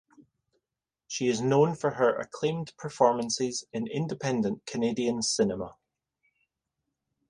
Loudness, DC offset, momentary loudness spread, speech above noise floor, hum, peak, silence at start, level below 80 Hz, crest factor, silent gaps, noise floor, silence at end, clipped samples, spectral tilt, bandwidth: -28 LUFS; under 0.1%; 10 LU; 62 dB; none; -8 dBFS; 0.2 s; -66 dBFS; 22 dB; none; -89 dBFS; 1.55 s; under 0.1%; -4.5 dB/octave; 11.5 kHz